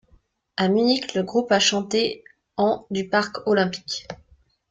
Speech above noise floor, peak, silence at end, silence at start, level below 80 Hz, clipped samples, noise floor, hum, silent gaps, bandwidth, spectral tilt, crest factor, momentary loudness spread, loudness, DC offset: 38 dB; -6 dBFS; 0.55 s; 0.6 s; -60 dBFS; under 0.1%; -60 dBFS; none; none; 9.4 kHz; -4 dB/octave; 18 dB; 16 LU; -22 LUFS; under 0.1%